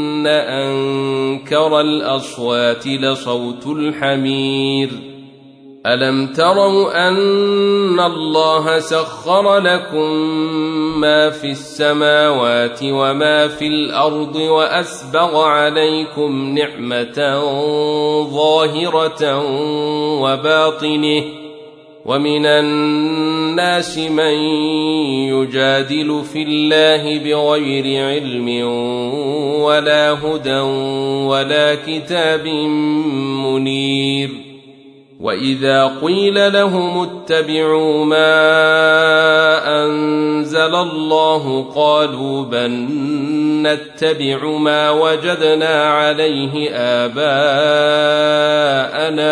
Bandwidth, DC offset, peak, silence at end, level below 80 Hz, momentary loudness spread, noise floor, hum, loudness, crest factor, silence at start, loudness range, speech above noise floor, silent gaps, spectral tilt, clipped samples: 10.5 kHz; under 0.1%; -2 dBFS; 0 s; -60 dBFS; 7 LU; -42 dBFS; none; -15 LUFS; 14 dB; 0 s; 4 LU; 27 dB; none; -5 dB/octave; under 0.1%